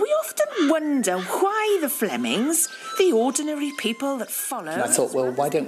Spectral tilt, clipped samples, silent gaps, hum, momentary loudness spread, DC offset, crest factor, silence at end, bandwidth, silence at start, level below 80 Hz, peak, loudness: -3 dB/octave; under 0.1%; none; none; 6 LU; under 0.1%; 18 dB; 0 s; 15.5 kHz; 0 s; -80 dBFS; -4 dBFS; -23 LUFS